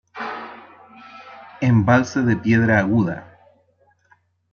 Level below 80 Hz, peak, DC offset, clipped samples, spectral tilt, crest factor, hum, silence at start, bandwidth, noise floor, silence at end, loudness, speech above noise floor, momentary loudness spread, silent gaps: -56 dBFS; -4 dBFS; under 0.1%; under 0.1%; -7.5 dB/octave; 18 dB; none; 0.15 s; 7 kHz; -61 dBFS; 1.3 s; -19 LUFS; 44 dB; 24 LU; none